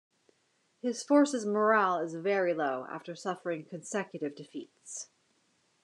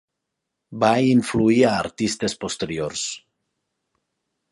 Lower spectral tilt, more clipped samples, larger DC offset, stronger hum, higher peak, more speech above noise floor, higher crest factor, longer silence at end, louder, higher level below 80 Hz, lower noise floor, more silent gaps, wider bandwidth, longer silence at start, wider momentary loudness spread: about the same, -4.5 dB/octave vs -5 dB/octave; neither; neither; neither; second, -12 dBFS vs -4 dBFS; second, 42 dB vs 61 dB; about the same, 20 dB vs 20 dB; second, 0.8 s vs 1.35 s; second, -31 LUFS vs -21 LUFS; second, under -90 dBFS vs -54 dBFS; second, -73 dBFS vs -81 dBFS; neither; about the same, 11 kHz vs 11.5 kHz; first, 0.85 s vs 0.7 s; first, 17 LU vs 11 LU